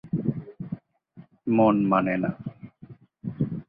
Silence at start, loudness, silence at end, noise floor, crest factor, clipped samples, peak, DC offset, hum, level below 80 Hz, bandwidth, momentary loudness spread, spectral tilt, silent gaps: 0.05 s; -24 LUFS; 0.05 s; -52 dBFS; 20 dB; under 0.1%; -8 dBFS; under 0.1%; none; -58 dBFS; 4.4 kHz; 20 LU; -12 dB/octave; none